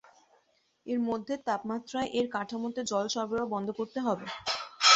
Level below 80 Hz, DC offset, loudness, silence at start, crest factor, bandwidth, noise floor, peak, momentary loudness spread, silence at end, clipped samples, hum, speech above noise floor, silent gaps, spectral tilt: -70 dBFS; under 0.1%; -32 LUFS; 0.85 s; 24 dB; 8.4 kHz; -71 dBFS; -8 dBFS; 4 LU; 0 s; under 0.1%; none; 38 dB; none; -2.5 dB/octave